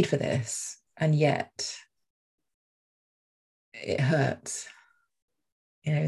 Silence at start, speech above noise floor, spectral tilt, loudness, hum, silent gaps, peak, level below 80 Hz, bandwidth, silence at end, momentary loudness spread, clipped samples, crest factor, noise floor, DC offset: 0 s; over 62 dB; -5 dB/octave; -29 LUFS; none; 2.10-2.38 s, 2.54-3.72 s, 5.22-5.28 s, 5.52-5.82 s; -10 dBFS; -64 dBFS; 12.5 kHz; 0 s; 15 LU; under 0.1%; 20 dB; under -90 dBFS; under 0.1%